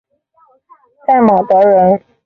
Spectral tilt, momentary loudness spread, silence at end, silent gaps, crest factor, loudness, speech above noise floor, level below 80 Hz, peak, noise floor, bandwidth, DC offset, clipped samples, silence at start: -10 dB/octave; 5 LU; 0.3 s; none; 12 dB; -11 LUFS; 44 dB; -54 dBFS; -2 dBFS; -53 dBFS; 4.8 kHz; under 0.1%; under 0.1%; 1.1 s